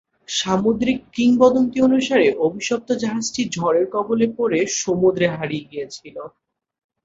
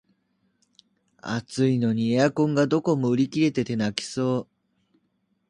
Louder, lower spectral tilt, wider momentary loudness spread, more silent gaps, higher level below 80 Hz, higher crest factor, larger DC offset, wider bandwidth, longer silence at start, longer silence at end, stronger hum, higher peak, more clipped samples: first, -19 LUFS vs -24 LUFS; second, -4.5 dB/octave vs -6.5 dB/octave; first, 15 LU vs 9 LU; neither; first, -56 dBFS vs -64 dBFS; about the same, 18 dB vs 22 dB; neither; second, 8 kHz vs 11 kHz; second, 0.3 s vs 1.25 s; second, 0.75 s vs 1.05 s; neither; first, 0 dBFS vs -4 dBFS; neither